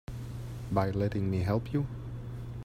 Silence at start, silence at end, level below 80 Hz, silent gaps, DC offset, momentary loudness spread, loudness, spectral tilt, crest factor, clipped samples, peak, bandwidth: 0.1 s; 0 s; -48 dBFS; none; under 0.1%; 11 LU; -33 LUFS; -8.5 dB/octave; 20 dB; under 0.1%; -12 dBFS; 14.5 kHz